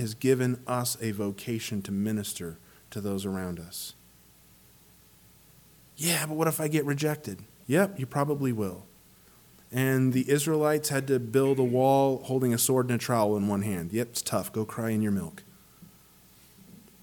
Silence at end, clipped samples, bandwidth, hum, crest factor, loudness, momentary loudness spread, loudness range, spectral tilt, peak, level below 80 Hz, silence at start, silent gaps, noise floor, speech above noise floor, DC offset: 0.3 s; under 0.1%; 19 kHz; none; 18 dB; -28 LUFS; 12 LU; 10 LU; -5 dB/octave; -10 dBFS; -64 dBFS; 0 s; none; -57 dBFS; 30 dB; under 0.1%